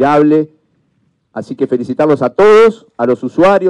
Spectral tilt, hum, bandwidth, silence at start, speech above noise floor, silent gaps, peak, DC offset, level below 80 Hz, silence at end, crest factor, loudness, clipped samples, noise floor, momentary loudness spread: -7 dB/octave; none; 9.6 kHz; 0 s; 49 dB; none; -2 dBFS; under 0.1%; -50 dBFS; 0 s; 8 dB; -11 LUFS; under 0.1%; -60 dBFS; 18 LU